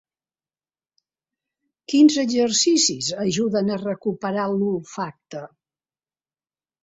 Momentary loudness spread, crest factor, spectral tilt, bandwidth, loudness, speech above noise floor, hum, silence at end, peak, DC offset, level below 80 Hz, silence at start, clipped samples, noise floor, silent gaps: 15 LU; 18 dB; -3.5 dB/octave; 8 kHz; -20 LUFS; over 69 dB; none; 1.35 s; -4 dBFS; under 0.1%; -66 dBFS; 1.9 s; under 0.1%; under -90 dBFS; none